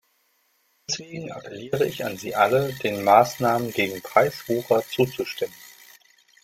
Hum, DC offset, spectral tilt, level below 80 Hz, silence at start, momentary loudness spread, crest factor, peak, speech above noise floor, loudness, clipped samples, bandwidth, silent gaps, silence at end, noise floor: none; under 0.1%; -4.5 dB/octave; -62 dBFS; 0.9 s; 17 LU; 22 dB; -4 dBFS; 44 dB; -23 LUFS; under 0.1%; 16.5 kHz; none; 0.75 s; -67 dBFS